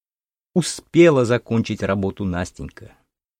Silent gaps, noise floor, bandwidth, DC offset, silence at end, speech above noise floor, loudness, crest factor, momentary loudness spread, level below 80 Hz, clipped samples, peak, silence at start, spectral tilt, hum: none; under -90 dBFS; 14 kHz; under 0.1%; 0.55 s; over 71 dB; -19 LUFS; 18 dB; 15 LU; -48 dBFS; under 0.1%; -2 dBFS; 0.55 s; -6 dB/octave; none